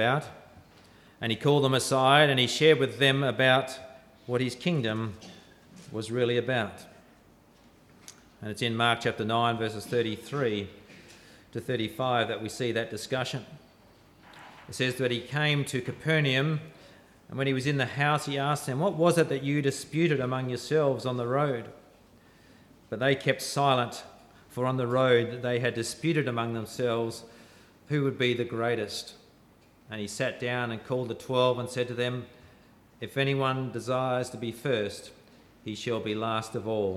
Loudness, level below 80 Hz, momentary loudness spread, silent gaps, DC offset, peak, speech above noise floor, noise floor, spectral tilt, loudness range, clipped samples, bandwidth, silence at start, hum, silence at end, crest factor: -28 LUFS; -68 dBFS; 15 LU; none; under 0.1%; -8 dBFS; 31 dB; -59 dBFS; -5 dB/octave; 8 LU; under 0.1%; 15 kHz; 0 s; none; 0 s; 22 dB